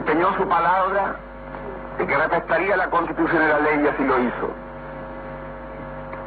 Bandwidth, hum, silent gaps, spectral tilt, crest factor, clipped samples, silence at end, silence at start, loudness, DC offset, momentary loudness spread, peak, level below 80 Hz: 4.8 kHz; none; none; -9.5 dB/octave; 16 dB; under 0.1%; 0 s; 0 s; -20 LUFS; under 0.1%; 16 LU; -6 dBFS; -44 dBFS